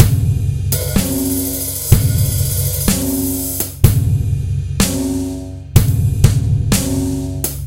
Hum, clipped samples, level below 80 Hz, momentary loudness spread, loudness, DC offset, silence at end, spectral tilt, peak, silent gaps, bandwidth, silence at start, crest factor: none; 0.3%; -24 dBFS; 6 LU; -16 LUFS; under 0.1%; 0 s; -5 dB/octave; 0 dBFS; none; 17.5 kHz; 0 s; 16 dB